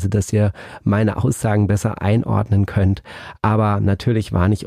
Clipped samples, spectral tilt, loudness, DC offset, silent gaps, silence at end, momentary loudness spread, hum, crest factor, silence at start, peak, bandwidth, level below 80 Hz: under 0.1%; -7.5 dB/octave; -19 LUFS; under 0.1%; none; 0 s; 5 LU; none; 12 dB; 0 s; -4 dBFS; 13.5 kHz; -40 dBFS